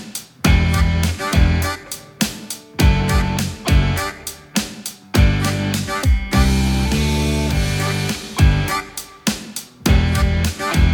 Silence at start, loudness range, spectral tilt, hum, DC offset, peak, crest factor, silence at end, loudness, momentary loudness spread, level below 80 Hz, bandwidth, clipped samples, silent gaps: 0 s; 2 LU; -5 dB/octave; none; under 0.1%; -2 dBFS; 16 dB; 0 s; -18 LUFS; 10 LU; -22 dBFS; 19 kHz; under 0.1%; none